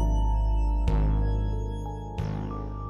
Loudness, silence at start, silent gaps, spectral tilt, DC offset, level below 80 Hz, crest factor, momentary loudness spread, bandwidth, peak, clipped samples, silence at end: -29 LUFS; 0 s; none; -8.5 dB/octave; under 0.1%; -26 dBFS; 12 dB; 8 LU; 6.2 kHz; -14 dBFS; under 0.1%; 0 s